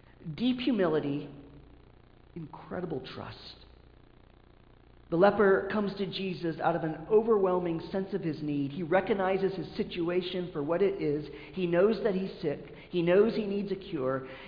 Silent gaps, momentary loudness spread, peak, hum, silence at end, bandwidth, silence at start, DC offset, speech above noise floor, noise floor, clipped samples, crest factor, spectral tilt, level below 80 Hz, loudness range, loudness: none; 15 LU; -10 dBFS; none; 0 s; 5.2 kHz; 0.2 s; under 0.1%; 28 dB; -57 dBFS; under 0.1%; 20 dB; -9 dB/octave; -58 dBFS; 13 LU; -30 LUFS